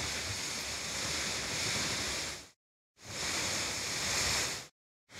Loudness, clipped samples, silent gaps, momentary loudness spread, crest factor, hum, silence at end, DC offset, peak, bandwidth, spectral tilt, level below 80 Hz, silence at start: -33 LUFS; under 0.1%; 2.56-2.95 s, 4.71-5.07 s; 11 LU; 16 dB; none; 0 s; under 0.1%; -20 dBFS; 16 kHz; -1 dB/octave; -56 dBFS; 0 s